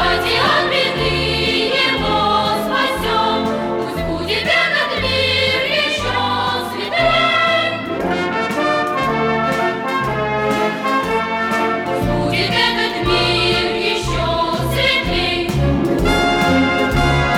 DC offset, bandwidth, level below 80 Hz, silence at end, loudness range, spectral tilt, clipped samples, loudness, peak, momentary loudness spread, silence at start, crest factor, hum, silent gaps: under 0.1%; 18 kHz; -32 dBFS; 0 s; 2 LU; -4.5 dB/octave; under 0.1%; -16 LUFS; -2 dBFS; 5 LU; 0 s; 14 dB; none; none